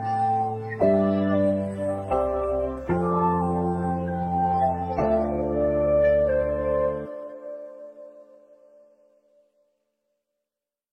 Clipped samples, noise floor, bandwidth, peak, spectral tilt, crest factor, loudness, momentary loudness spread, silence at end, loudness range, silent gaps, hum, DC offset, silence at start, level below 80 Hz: under 0.1%; -88 dBFS; 9 kHz; -10 dBFS; -9.5 dB/octave; 16 dB; -24 LUFS; 16 LU; 2.7 s; 9 LU; none; none; under 0.1%; 0 s; -44 dBFS